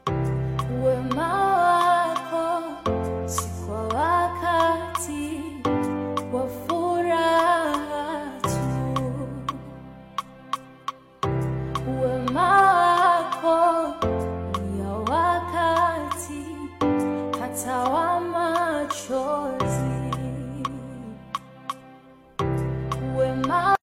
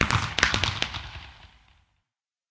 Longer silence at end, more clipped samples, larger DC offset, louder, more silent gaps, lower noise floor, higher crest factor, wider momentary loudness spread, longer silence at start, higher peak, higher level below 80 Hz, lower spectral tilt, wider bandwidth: second, 0.05 s vs 1.05 s; neither; neither; about the same, -24 LUFS vs -25 LUFS; neither; second, -49 dBFS vs -86 dBFS; second, 18 dB vs 28 dB; second, 14 LU vs 20 LU; about the same, 0.05 s vs 0 s; second, -6 dBFS vs -2 dBFS; about the same, -46 dBFS vs -42 dBFS; first, -5.5 dB/octave vs -3 dB/octave; first, 16.5 kHz vs 8 kHz